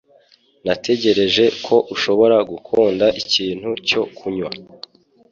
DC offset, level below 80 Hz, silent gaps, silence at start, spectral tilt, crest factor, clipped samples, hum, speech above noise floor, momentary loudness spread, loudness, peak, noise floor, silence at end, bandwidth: under 0.1%; -56 dBFS; none; 0.65 s; -4 dB/octave; 16 dB; under 0.1%; none; 37 dB; 12 LU; -17 LUFS; -2 dBFS; -54 dBFS; 0.7 s; 7.4 kHz